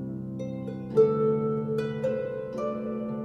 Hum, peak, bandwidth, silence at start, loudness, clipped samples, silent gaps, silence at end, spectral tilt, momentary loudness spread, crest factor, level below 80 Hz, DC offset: none; -10 dBFS; 7 kHz; 0 s; -28 LUFS; under 0.1%; none; 0 s; -9 dB/octave; 12 LU; 18 dB; -60 dBFS; under 0.1%